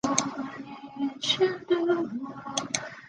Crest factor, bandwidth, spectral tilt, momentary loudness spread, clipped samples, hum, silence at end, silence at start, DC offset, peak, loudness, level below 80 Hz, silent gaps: 24 dB; 10.5 kHz; -2.5 dB/octave; 12 LU; under 0.1%; none; 0 s; 0.05 s; under 0.1%; -4 dBFS; -29 LUFS; -68 dBFS; none